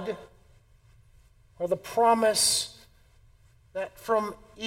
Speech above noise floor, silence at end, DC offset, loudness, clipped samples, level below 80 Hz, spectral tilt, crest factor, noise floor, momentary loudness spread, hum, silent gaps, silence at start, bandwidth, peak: 32 dB; 0 s; under 0.1%; -26 LUFS; under 0.1%; -60 dBFS; -1.5 dB/octave; 20 dB; -59 dBFS; 16 LU; none; none; 0 s; 16.5 kHz; -10 dBFS